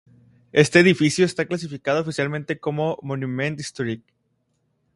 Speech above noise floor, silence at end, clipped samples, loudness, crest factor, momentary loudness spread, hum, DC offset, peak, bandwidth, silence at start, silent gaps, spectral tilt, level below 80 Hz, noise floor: 49 dB; 1 s; under 0.1%; -21 LUFS; 22 dB; 13 LU; none; under 0.1%; 0 dBFS; 11.5 kHz; 0.55 s; none; -5.5 dB/octave; -60 dBFS; -70 dBFS